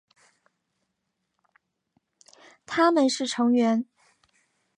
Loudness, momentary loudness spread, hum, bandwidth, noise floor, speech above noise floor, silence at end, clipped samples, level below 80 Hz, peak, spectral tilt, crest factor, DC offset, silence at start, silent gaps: -23 LUFS; 10 LU; none; 11 kHz; -79 dBFS; 57 dB; 0.95 s; under 0.1%; -76 dBFS; -10 dBFS; -3.5 dB/octave; 20 dB; under 0.1%; 2.7 s; none